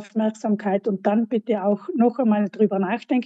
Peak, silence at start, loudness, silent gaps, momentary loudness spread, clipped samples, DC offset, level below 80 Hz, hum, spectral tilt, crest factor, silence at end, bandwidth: -6 dBFS; 0 s; -22 LUFS; none; 4 LU; under 0.1%; under 0.1%; -80 dBFS; none; -8 dB/octave; 14 dB; 0 s; 8 kHz